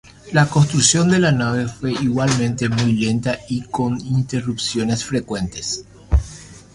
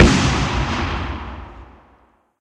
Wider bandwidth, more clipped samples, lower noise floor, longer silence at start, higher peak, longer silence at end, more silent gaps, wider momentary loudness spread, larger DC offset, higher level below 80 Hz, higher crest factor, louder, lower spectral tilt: about the same, 11.5 kHz vs 11 kHz; neither; second, -39 dBFS vs -56 dBFS; first, 0.25 s vs 0 s; about the same, 0 dBFS vs 0 dBFS; second, 0.15 s vs 0.75 s; neither; second, 11 LU vs 20 LU; neither; second, -32 dBFS vs -26 dBFS; about the same, 18 dB vs 20 dB; about the same, -19 LUFS vs -20 LUFS; about the same, -4.5 dB/octave vs -5 dB/octave